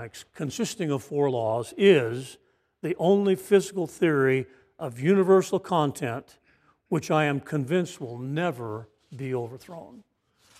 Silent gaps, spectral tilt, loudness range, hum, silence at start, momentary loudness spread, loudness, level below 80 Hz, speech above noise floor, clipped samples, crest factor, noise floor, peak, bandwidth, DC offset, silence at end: none; -6 dB/octave; 6 LU; none; 0 s; 18 LU; -25 LUFS; -70 dBFS; 39 dB; under 0.1%; 20 dB; -64 dBFS; -6 dBFS; 15 kHz; under 0.1%; 0.65 s